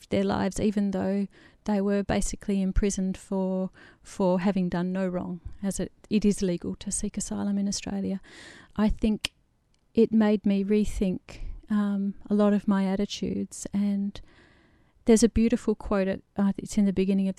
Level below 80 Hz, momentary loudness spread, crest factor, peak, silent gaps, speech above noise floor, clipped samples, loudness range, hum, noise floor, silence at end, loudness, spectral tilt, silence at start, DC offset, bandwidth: -42 dBFS; 11 LU; 20 dB; -6 dBFS; none; 41 dB; under 0.1%; 3 LU; none; -67 dBFS; 0.05 s; -27 LUFS; -6 dB/octave; 0.1 s; under 0.1%; 12 kHz